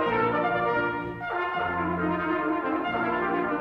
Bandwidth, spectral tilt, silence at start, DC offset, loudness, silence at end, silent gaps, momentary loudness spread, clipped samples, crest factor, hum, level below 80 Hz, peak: 6 kHz; -8 dB/octave; 0 s; under 0.1%; -27 LUFS; 0 s; none; 5 LU; under 0.1%; 14 dB; none; -54 dBFS; -14 dBFS